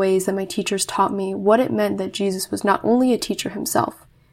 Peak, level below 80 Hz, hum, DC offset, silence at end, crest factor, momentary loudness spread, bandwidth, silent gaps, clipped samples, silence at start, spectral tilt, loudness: -2 dBFS; -58 dBFS; none; under 0.1%; 0.4 s; 18 dB; 6 LU; 16.5 kHz; none; under 0.1%; 0 s; -4.5 dB/octave; -21 LUFS